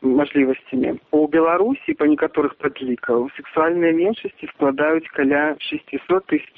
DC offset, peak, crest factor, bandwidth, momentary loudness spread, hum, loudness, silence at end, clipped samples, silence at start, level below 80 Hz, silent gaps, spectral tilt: under 0.1%; -4 dBFS; 16 dB; 4.1 kHz; 8 LU; none; -20 LUFS; 0.1 s; under 0.1%; 0 s; -58 dBFS; none; -4 dB/octave